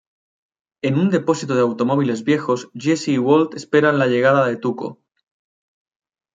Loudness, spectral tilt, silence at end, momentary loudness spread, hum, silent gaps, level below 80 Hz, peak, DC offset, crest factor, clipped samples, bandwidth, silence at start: -18 LUFS; -6.5 dB/octave; 1.4 s; 8 LU; none; none; -66 dBFS; -2 dBFS; under 0.1%; 18 dB; under 0.1%; 9.2 kHz; 0.85 s